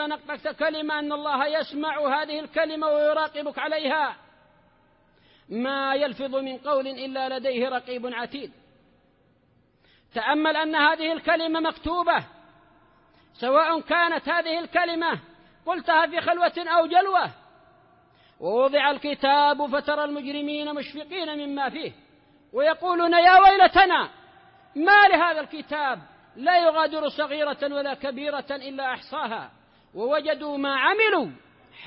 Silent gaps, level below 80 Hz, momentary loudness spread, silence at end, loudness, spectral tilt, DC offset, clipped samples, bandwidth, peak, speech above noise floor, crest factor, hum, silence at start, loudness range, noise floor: none; -60 dBFS; 13 LU; 0 s; -23 LUFS; -7.5 dB/octave; under 0.1%; under 0.1%; 5.8 kHz; -6 dBFS; 40 dB; 20 dB; none; 0 s; 10 LU; -63 dBFS